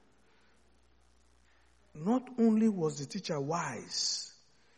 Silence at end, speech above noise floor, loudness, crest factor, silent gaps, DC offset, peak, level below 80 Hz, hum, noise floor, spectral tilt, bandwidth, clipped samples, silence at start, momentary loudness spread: 0.45 s; 36 dB; -32 LUFS; 18 dB; none; under 0.1%; -18 dBFS; -72 dBFS; none; -68 dBFS; -4.5 dB/octave; 10 kHz; under 0.1%; 1.95 s; 11 LU